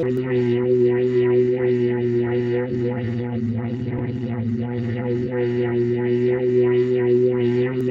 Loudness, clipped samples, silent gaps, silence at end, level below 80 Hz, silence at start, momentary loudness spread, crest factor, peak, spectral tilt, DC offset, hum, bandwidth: -21 LUFS; under 0.1%; none; 0 s; -52 dBFS; 0 s; 7 LU; 12 dB; -8 dBFS; -10 dB/octave; under 0.1%; none; 4.9 kHz